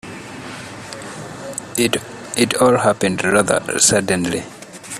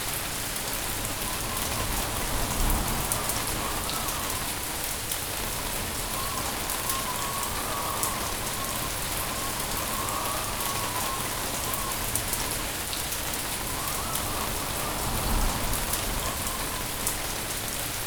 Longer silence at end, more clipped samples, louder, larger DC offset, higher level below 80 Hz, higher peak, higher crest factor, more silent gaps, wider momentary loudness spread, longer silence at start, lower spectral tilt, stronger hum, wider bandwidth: about the same, 0 s vs 0 s; neither; first, -17 LUFS vs -28 LUFS; second, under 0.1% vs 0.2%; second, -52 dBFS vs -38 dBFS; first, 0 dBFS vs -4 dBFS; second, 20 dB vs 26 dB; neither; first, 18 LU vs 2 LU; about the same, 0.05 s vs 0 s; about the same, -3 dB/octave vs -2 dB/octave; neither; second, 15.5 kHz vs over 20 kHz